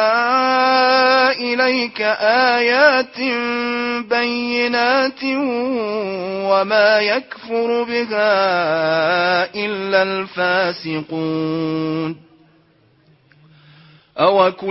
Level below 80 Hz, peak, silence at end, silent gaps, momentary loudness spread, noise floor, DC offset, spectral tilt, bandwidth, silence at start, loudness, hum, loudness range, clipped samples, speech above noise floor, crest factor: -64 dBFS; 0 dBFS; 0 s; none; 9 LU; -55 dBFS; under 0.1%; -7 dB/octave; 6 kHz; 0 s; -17 LUFS; none; 8 LU; under 0.1%; 38 dB; 16 dB